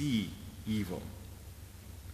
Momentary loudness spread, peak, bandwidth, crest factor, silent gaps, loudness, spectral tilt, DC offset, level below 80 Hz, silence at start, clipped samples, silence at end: 15 LU; -20 dBFS; 15.5 kHz; 18 dB; none; -39 LUFS; -5.5 dB/octave; under 0.1%; -52 dBFS; 0 s; under 0.1%; 0 s